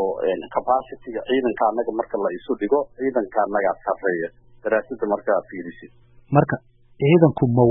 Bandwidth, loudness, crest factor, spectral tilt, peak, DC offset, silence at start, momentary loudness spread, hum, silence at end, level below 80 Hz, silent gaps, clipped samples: 3.9 kHz; -22 LUFS; 20 dB; -12.5 dB/octave; -2 dBFS; under 0.1%; 0 s; 13 LU; none; 0 s; -54 dBFS; none; under 0.1%